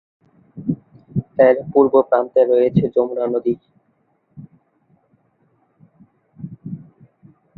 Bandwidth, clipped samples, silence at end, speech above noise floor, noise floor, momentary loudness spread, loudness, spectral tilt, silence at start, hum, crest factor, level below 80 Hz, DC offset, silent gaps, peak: 4.2 kHz; under 0.1%; 0.75 s; 48 dB; -64 dBFS; 20 LU; -17 LUFS; -11.5 dB/octave; 0.55 s; none; 18 dB; -56 dBFS; under 0.1%; none; -2 dBFS